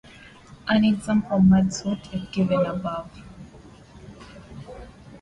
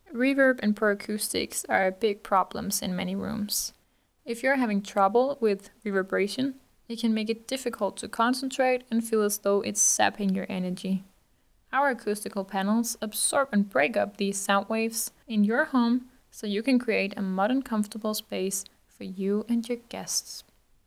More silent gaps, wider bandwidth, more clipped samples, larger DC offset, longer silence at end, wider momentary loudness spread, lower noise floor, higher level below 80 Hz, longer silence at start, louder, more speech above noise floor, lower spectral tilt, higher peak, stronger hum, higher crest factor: neither; second, 10.5 kHz vs 16.5 kHz; neither; neither; second, 0.05 s vs 0.45 s; first, 26 LU vs 8 LU; second, -47 dBFS vs -67 dBFS; first, -48 dBFS vs -64 dBFS; first, 0.5 s vs 0.1 s; first, -22 LUFS vs -27 LUFS; second, 25 dB vs 40 dB; first, -6.5 dB/octave vs -3.5 dB/octave; about the same, -8 dBFS vs -6 dBFS; neither; second, 16 dB vs 22 dB